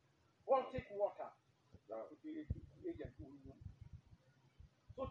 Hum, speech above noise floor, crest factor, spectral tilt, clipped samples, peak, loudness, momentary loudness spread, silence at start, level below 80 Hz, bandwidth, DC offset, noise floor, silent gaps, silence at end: none; 21 dB; 24 dB; -6.5 dB/octave; under 0.1%; -24 dBFS; -45 LUFS; 20 LU; 0.45 s; -62 dBFS; 7 kHz; under 0.1%; -69 dBFS; none; 0 s